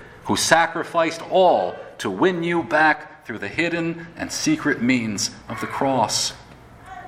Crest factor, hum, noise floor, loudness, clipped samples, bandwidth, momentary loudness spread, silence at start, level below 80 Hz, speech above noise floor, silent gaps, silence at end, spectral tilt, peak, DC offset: 22 dB; none; -44 dBFS; -21 LUFS; under 0.1%; 16.5 kHz; 12 LU; 0 s; -54 dBFS; 23 dB; none; 0 s; -3.5 dB/octave; 0 dBFS; under 0.1%